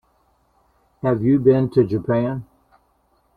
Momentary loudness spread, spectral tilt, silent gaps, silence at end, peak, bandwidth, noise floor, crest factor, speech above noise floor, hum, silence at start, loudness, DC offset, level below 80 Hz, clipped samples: 10 LU; -11 dB/octave; none; 0.95 s; -4 dBFS; 4.8 kHz; -63 dBFS; 18 dB; 45 dB; none; 1.05 s; -19 LUFS; under 0.1%; -52 dBFS; under 0.1%